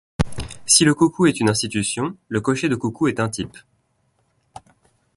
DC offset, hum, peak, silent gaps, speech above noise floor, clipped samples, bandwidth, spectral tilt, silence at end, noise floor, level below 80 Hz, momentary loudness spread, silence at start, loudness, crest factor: under 0.1%; none; 0 dBFS; none; 47 dB; under 0.1%; 12 kHz; -4 dB/octave; 1.6 s; -66 dBFS; -42 dBFS; 12 LU; 0.2 s; -19 LUFS; 22 dB